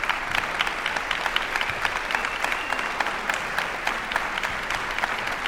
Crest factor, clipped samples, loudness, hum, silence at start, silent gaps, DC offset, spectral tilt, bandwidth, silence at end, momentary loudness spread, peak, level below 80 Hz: 22 dB; under 0.1%; -25 LUFS; none; 0 s; none; under 0.1%; -1.5 dB/octave; 17 kHz; 0 s; 2 LU; -4 dBFS; -46 dBFS